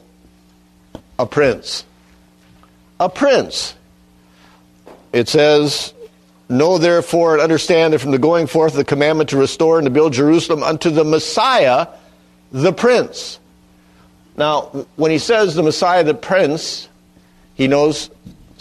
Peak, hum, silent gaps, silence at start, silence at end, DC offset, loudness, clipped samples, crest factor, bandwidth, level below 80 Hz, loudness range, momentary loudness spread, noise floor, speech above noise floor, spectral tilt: 0 dBFS; none; none; 1.2 s; 0.3 s; under 0.1%; -15 LUFS; under 0.1%; 16 dB; 13 kHz; -52 dBFS; 6 LU; 12 LU; -50 dBFS; 36 dB; -5 dB/octave